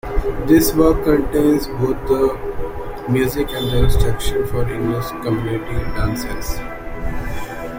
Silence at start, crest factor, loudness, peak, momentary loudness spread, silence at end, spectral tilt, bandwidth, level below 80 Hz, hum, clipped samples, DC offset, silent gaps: 0.05 s; 16 dB; -19 LUFS; -2 dBFS; 14 LU; 0 s; -6 dB/octave; 16.5 kHz; -26 dBFS; none; under 0.1%; under 0.1%; none